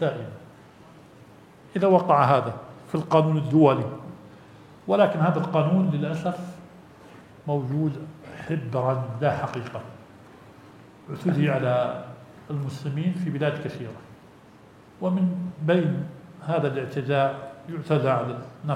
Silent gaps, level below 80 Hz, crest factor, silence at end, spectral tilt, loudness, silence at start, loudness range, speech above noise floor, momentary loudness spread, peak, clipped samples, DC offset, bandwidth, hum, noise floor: none; -66 dBFS; 22 dB; 0 s; -8.5 dB/octave; -25 LUFS; 0 s; 7 LU; 27 dB; 19 LU; -4 dBFS; under 0.1%; under 0.1%; 10.5 kHz; none; -50 dBFS